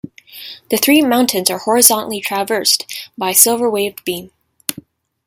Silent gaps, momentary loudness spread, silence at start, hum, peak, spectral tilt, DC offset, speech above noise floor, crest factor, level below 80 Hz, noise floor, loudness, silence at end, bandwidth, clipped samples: none; 17 LU; 0.35 s; none; 0 dBFS; -1.5 dB/octave; under 0.1%; 25 dB; 16 dB; -62 dBFS; -40 dBFS; -13 LUFS; 0.45 s; over 20 kHz; 0.1%